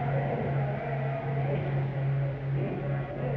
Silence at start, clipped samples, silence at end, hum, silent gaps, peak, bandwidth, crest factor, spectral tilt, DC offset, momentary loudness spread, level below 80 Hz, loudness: 0 s; under 0.1%; 0 s; none; none; -18 dBFS; 4.1 kHz; 12 dB; -10.5 dB/octave; under 0.1%; 2 LU; -50 dBFS; -31 LUFS